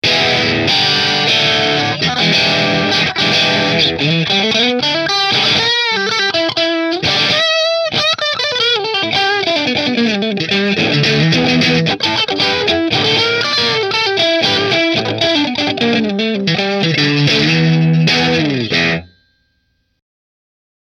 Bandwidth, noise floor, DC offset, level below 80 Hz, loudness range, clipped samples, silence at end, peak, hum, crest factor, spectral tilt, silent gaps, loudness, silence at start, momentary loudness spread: 14 kHz; -63 dBFS; under 0.1%; -48 dBFS; 2 LU; under 0.1%; 1.8 s; 0 dBFS; none; 14 dB; -4 dB/octave; none; -12 LUFS; 0.05 s; 4 LU